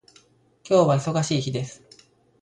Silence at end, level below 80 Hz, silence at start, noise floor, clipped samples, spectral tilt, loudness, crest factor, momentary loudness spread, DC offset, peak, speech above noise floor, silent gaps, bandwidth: 0.65 s; -60 dBFS; 0.65 s; -58 dBFS; under 0.1%; -6 dB/octave; -22 LUFS; 18 dB; 12 LU; under 0.1%; -8 dBFS; 36 dB; none; 11 kHz